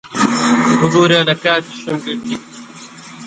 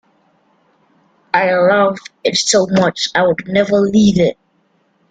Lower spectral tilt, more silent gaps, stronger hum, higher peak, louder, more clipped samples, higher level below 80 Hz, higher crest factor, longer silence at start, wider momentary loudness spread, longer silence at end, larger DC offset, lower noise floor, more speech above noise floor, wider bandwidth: about the same, -4.5 dB/octave vs -4.5 dB/octave; neither; neither; about the same, 0 dBFS vs -2 dBFS; about the same, -14 LUFS vs -14 LUFS; neither; about the same, -54 dBFS vs -50 dBFS; about the same, 16 dB vs 14 dB; second, 0.05 s vs 1.35 s; first, 23 LU vs 6 LU; second, 0 s vs 0.8 s; neither; second, -35 dBFS vs -59 dBFS; second, 20 dB vs 46 dB; about the same, 9.4 kHz vs 9.4 kHz